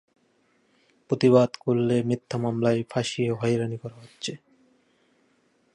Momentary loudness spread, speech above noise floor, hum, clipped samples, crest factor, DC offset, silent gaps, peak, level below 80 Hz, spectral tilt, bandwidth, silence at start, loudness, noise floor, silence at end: 15 LU; 42 dB; none; under 0.1%; 20 dB; under 0.1%; none; -6 dBFS; -64 dBFS; -6.5 dB/octave; 11 kHz; 1.1 s; -25 LUFS; -66 dBFS; 1.4 s